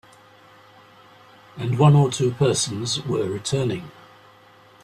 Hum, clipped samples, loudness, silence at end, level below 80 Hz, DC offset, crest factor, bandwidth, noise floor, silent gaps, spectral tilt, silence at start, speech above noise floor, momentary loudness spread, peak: none; under 0.1%; -21 LUFS; 0.95 s; -56 dBFS; under 0.1%; 18 dB; 13 kHz; -51 dBFS; none; -5.5 dB/octave; 1.55 s; 31 dB; 13 LU; -4 dBFS